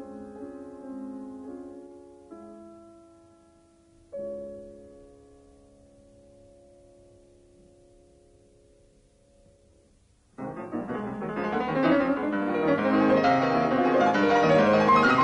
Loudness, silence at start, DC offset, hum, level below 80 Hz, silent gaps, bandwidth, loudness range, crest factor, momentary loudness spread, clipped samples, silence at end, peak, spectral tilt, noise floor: -24 LUFS; 0 s; under 0.1%; none; -60 dBFS; none; 10.5 kHz; 22 LU; 16 dB; 25 LU; under 0.1%; 0 s; -12 dBFS; -6.5 dB/octave; -62 dBFS